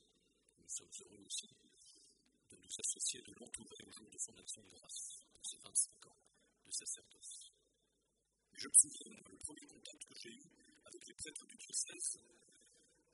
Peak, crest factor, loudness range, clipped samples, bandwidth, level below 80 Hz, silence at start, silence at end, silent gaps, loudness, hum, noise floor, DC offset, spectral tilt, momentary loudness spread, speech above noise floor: -12 dBFS; 34 dB; 10 LU; under 0.1%; 11.5 kHz; -82 dBFS; 0.7 s; 0.95 s; none; -40 LUFS; none; -84 dBFS; under 0.1%; 1 dB/octave; 19 LU; 40 dB